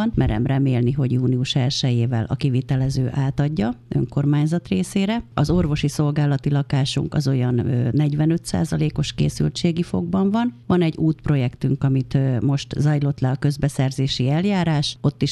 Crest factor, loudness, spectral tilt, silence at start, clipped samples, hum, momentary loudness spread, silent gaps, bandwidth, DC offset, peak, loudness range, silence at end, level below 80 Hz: 14 dB; -21 LUFS; -7 dB/octave; 0 s; under 0.1%; none; 3 LU; none; 12 kHz; under 0.1%; -6 dBFS; 1 LU; 0 s; -40 dBFS